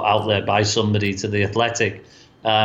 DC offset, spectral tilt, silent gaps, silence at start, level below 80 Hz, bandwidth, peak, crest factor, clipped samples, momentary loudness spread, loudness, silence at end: under 0.1%; -4.5 dB/octave; none; 0 s; -54 dBFS; 8.2 kHz; -4 dBFS; 16 dB; under 0.1%; 5 LU; -20 LUFS; 0 s